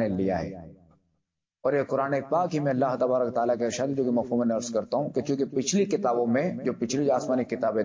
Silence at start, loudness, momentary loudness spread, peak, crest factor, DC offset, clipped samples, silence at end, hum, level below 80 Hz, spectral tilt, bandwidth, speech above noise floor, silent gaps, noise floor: 0 s; -27 LUFS; 4 LU; -14 dBFS; 14 dB; under 0.1%; under 0.1%; 0 s; none; -60 dBFS; -5.5 dB/octave; 7.6 kHz; 54 dB; none; -80 dBFS